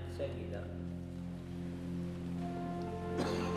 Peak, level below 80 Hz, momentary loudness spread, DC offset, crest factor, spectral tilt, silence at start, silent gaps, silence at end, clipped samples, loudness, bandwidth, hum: -24 dBFS; -58 dBFS; 7 LU; under 0.1%; 16 dB; -7 dB/octave; 0 s; none; 0 s; under 0.1%; -41 LUFS; 13 kHz; none